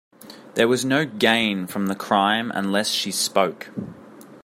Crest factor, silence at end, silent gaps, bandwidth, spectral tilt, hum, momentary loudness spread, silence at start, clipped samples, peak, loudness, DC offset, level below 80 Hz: 22 dB; 0.05 s; none; 16 kHz; -3.5 dB/octave; none; 12 LU; 0.2 s; under 0.1%; -2 dBFS; -21 LUFS; under 0.1%; -68 dBFS